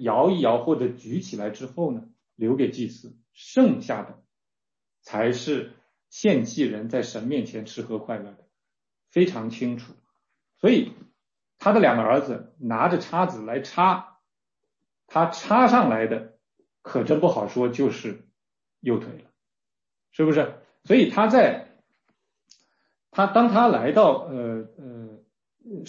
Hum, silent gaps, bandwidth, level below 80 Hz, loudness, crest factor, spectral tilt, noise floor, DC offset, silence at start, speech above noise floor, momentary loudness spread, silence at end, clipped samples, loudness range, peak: none; none; 7.4 kHz; -70 dBFS; -23 LUFS; 18 dB; -6.5 dB/octave; under -90 dBFS; under 0.1%; 0 s; over 68 dB; 16 LU; 0.05 s; under 0.1%; 6 LU; -6 dBFS